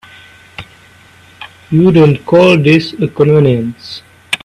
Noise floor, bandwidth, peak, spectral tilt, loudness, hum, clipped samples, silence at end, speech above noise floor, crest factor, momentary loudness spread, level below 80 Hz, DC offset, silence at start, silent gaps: -42 dBFS; 11.5 kHz; 0 dBFS; -7.5 dB/octave; -10 LUFS; none; under 0.1%; 0.1 s; 33 dB; 12 dB; 24 LU; -46 dBFS; under 0.1%; 0.6 s; none